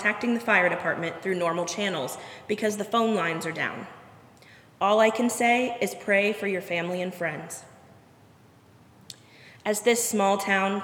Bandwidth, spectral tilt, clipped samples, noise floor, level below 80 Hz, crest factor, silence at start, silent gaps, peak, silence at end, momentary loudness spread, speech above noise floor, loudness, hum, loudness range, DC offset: 18.5 kHz; -3.5 dB/octave; under 0.1%; -55 dBFS; -74 dBFS; 20 dB; 0 s; none; -6 dBFS; 0 s; 16 LU; 29 dB; -25 LUFS; none; 6 LU; under 0.1%